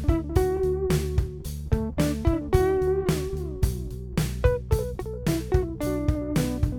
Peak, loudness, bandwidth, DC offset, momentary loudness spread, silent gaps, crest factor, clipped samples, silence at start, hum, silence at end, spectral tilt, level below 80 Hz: -8 dBFS; -26 LUFS; 19.5 kHz; under 0.1%; 7 LU; none; 18 dB; under 0.1%; 0 s; none; 0 s; -7 dB/octave; -32 dBFS